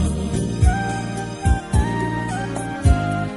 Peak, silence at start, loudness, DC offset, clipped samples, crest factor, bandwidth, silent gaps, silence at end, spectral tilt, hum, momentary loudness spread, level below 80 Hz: -2 dBFS; 0 s; -21 LUFS; under 0.1%; under 0.1%; 18 dB; 11.5 kHz; none; 0 s; -6.5 dB/octave; none; 7 LU; -24 dBFS